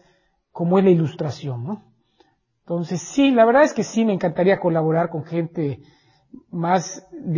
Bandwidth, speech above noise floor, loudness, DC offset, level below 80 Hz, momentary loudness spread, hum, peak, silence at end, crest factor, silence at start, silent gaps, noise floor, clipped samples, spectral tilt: 7.4 kHz; 43 dB; -20 LUFS; under 0.1%; -62 dBFS; 16 LU; none; -4 dBFS; 0 s; 18 dB; 0.55 s; none; -63 dBFS; under 0.1%; -6.5 dB/octave